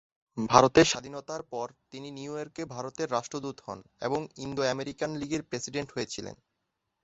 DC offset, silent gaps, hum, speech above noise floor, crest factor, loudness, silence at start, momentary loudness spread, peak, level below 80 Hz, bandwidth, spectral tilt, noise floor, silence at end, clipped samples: under 0.1%; none; none; 52 dB; 28 dB; -29 LUFS; 0.35 s; 18 LU; -2 dBFS; -58 dBFS; 8.2 kHz; -4 dB/octave; -82 dBFS; 0.7 s; under 0.1%